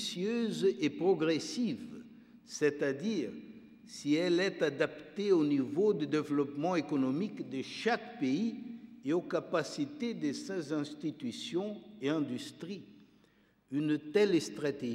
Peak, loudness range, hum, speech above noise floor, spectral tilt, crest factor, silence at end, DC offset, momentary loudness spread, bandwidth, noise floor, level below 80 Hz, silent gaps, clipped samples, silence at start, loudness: -16 dBFS; 6 LU; none; 35 dB; -5.5 dB/octave; 18 dB; 0 s; under 0.1%; 13 LU; 13 kHz; -68 dBFS; -80 dBFS; none; under 0.1%; 0 s; -34 LUFS